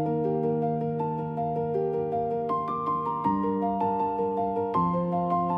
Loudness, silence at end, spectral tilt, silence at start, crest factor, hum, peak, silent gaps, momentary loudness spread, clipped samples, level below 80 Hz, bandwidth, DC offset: -28 LUFS; 0 s; -11 dB/octave; 0 s; 14 dB; none; -14 dBFS; none; 3 LU; under 0.1%; -58 dBFS; 5.4 kHz; under 0.1%